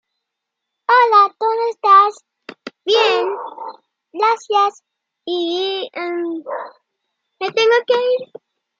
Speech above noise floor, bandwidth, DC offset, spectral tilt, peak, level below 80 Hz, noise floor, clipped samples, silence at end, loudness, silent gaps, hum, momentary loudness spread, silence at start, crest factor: 61 dB; 7.6 kHz; under 0.1%; -2 dB/octave; -2 dBFS; -86 dBFS; -79 dBFS; under 0.1%; 0.55 s; -16 LUFS; none; none; 22 LU; 0.9 s; 16 dB